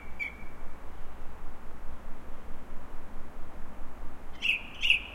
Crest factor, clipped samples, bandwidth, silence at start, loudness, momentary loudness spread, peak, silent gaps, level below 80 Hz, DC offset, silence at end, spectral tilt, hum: 22 dB; under 0.1%; 11 kHz; 0 s; -29 LUFS; 20 LU; -8 dBFS; none; -40 dBFS; under 0.1%; 0 s; -3 dB/octave; none